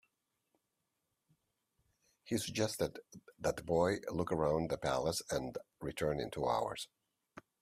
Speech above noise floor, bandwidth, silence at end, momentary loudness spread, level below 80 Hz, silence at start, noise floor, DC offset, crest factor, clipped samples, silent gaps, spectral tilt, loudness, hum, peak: 49 dB; 15.5 kHz; 0.2 s; 11 LU; -62 dBFS; 2.25 s; -86 dBFS; under 0.1%; 20 dB; under 0.1%; none; -5 dB/octave; -37 LUFS; none; -18 dBFS